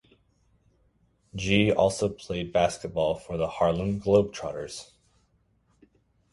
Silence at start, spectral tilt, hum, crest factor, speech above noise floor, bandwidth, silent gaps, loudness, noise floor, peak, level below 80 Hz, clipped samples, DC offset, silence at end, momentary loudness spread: 1.35 s; -5.5 dB/octave; none; 22 dB; 42 dB; 11.5 kHz; none; -26 LUFS; -68 dBFS; -6 dBFS; -50 dBFS; under 0.1%; under 0.1%; 1.5 s; 13 LU